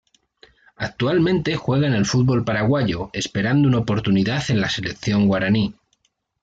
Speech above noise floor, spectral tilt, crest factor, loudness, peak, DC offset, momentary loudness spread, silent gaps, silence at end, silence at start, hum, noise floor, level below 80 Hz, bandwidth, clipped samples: 48 dB; -6 dB/octave; 12 dB; -20 LUFS; -8 dBFS; under 0.1%; 6 LU; none; 0.7 s; 0.8 s; none; -67 dBFS; -48 dBFS; 8 kHz; under 0.1%